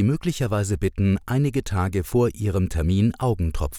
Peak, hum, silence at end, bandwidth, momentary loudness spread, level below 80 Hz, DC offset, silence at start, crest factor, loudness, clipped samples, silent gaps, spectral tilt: -8 dBFS; none; 0 s; 17.5 kHz; 3 LU; -36 dBFS; under 0.1%; 0 s; 12 dB; -23 LUFS; under 0.1%; none; -7 dB/octave